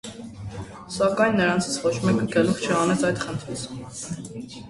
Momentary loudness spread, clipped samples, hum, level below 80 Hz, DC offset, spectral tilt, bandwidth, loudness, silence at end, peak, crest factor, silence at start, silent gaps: 16 LU; under 0.1%; none; -52 dBFS; under 0.1%; -5 dB/octave; 11.5 kHz; -23 LUFS; 0 s; -6 dBFS; 18 dB; 0.05 s; none